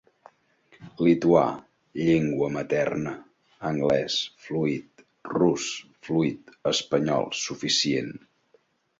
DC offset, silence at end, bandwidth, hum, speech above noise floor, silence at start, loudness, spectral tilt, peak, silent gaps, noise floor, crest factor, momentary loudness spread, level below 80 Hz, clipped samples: under 0.1%; 0.85 s; 8 kHz; none; 40 dB; 0.8 s; -25 LUFS; -4.5 dB/octave; -4 dBFS; none; -65 dBFS; 22 dB; 13 LU; -62 dBFS; under 0.1%